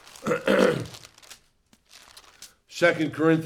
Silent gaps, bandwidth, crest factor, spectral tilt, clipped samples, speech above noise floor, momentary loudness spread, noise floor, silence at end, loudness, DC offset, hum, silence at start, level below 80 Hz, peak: none; 16 kHz; 20 dB; -5.5 dB/octave; under 0.1%; 41 dB; 24 LU; -63 dBFS; 0 s; -23 LUFS; under 0.1%; none; 0.2 s; -62 dBFS; -6 dBFS